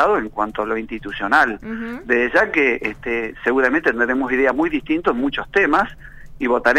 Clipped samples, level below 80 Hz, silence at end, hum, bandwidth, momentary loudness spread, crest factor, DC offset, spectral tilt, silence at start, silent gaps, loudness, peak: under 0.1%; -42 dBFS; 0 s; none; 13.5 kHz; 10 LU; 18 dB; under 0.1%; -5.5 dB/octave; 0 s; none; -19 LUFS; -2 dBFS